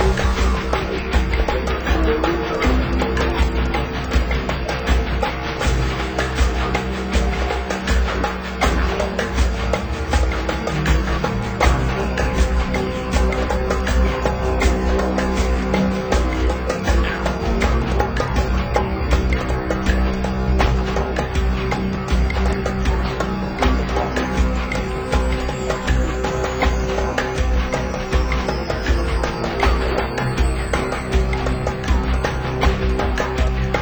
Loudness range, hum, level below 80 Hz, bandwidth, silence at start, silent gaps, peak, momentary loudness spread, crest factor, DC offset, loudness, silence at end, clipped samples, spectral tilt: 1 LU; none; -22 dBFS; over 20 kHz; 0 s; none; -4 dBFS; 3 LU; 16 dB; under 0.1%; -20 LUFS; 0 s; under 0.1%; -6 dB/octave